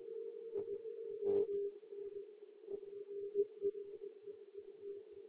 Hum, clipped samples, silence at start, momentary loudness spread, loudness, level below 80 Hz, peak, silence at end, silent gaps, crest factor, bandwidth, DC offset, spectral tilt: none; under 0.1%; 0 s; 16 LU; -44 LUFS; -84 dBFS; -26 dBFS; 0 s; none; 18 dB; 4 kHz; under 0.1%; -7.5 dB/octave